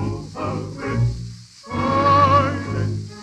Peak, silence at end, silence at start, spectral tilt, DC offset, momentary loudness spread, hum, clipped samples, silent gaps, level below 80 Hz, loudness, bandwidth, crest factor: -2 dBFS; 0 s; 0 s; -7 dB/octave; under 0.1%; 16 LU; none; under 0.1%; none; -40 dBFS; -20 LUFS; 9.6 kHz; 18 dB